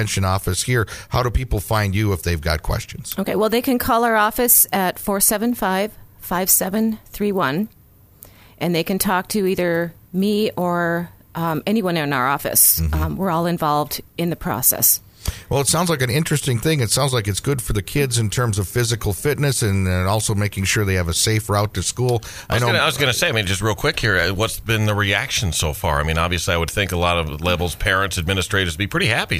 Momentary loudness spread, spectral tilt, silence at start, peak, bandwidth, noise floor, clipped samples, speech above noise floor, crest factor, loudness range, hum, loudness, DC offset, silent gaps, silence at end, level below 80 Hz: 8 LU; -4 dB/octave; 0 s; -2 dBFS; 16 kHz; -47 dBFS; under 0.1%; 28 dB; 18 dB; 4 LU; none; -19 LUFS; under 0.1%; none; 0 s; -34 dBFS